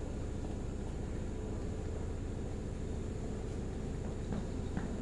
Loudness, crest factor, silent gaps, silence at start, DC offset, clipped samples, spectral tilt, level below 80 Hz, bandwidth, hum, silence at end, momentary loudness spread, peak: -41 LUFS; 16 dB; none; 0 s; under 0.1%; under 0.1%; -7 dB/octave; -42 dBFS; 11.5 kHz; none; 0 s; 2 LU; -22 dBFS